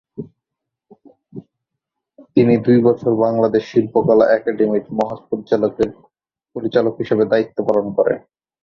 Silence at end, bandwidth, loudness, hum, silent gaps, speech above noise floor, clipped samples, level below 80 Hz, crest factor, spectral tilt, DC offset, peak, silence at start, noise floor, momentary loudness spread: 0.45 s; 6.8 kHz; -17 LUFS; none; none; 66 dB; under 0.1%; -56 dBFS; 16 dB; -9 dB/octave; under 0.1%; -2 dBFS; 0.2 s; -81 dBFS; 12 LU